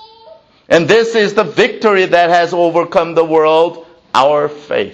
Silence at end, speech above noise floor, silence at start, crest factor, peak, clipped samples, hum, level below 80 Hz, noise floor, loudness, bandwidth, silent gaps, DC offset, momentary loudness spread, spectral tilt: 0 s; 30 dB; 0 s; 12 dB; 0 dBFS; under 0.1%; none; -54 dBFS; -42 dBFS; -12 LUFS; 8.4 kHz; none; under 0.1%; 6 LU; -5 dB/octave